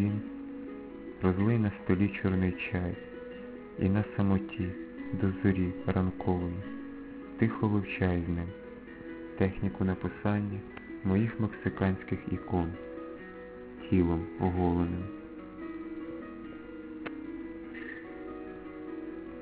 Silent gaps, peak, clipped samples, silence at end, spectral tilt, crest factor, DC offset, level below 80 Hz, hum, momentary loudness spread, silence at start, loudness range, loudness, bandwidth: none; -12 dBFS; under 0.1%; 0 s; -8 dB/octave; 20 dB; under 0.1%; -46 dBFS; none; 15 LU; 0 s; 8 LU; -33 LUFS; 4 kHz